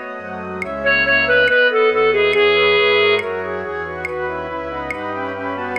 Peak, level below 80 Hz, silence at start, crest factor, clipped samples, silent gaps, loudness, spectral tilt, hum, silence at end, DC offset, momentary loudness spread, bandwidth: -4 dBFS; -46 dBFS; 0 s; 12 dB; under 0.1%; none; -16 LUFS; -5 dB/octave; none; 0 s; 0.1%; 12 LU; 9 kHz